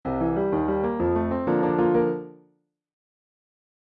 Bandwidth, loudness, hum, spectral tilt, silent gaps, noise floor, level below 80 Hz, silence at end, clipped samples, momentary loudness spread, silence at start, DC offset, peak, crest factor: 4.4 kHz; -24 LUFS; none; -11.5 dB/octave; none; -67 dBFS; -48 dBFS; 1.5 s; under 0.1%; 6 LU; 0.05 s; under 0.1%; -10 dBFS; 16 dB